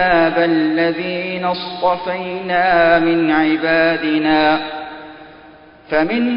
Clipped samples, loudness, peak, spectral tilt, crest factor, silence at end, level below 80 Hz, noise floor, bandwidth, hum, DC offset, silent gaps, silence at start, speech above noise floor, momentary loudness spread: under 0.1%; -16 LUFS; 0 dBFS; -10.5 dB/octave; 16 dB; 0 s; -48 dBFS; -42 dBFS; 5.4 kHz; none; under 0.1%; none; 0 s; 27 dB; 10 LU